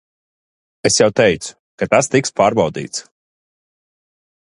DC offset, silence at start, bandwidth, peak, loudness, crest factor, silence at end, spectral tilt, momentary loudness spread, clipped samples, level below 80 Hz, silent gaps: under 0.1%; 0.85 s; 11.5 kHz; 0 dBFS; -16 LUFS; 18 dB; 1.4 s; -3.5 dB/octave; 13 LU; under 0.1%; -52 dBFS; 1.59-1.78 s